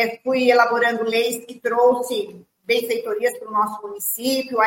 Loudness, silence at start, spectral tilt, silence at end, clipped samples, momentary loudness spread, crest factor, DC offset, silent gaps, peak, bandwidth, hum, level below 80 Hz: -20 LUFS; 0 s; -2.5 dB/octave; 0 s; under 0.1%; 10 LU; 18 dB; under 0.1%; none; -2 dBFS; 17 kHz; none; -72 dBFS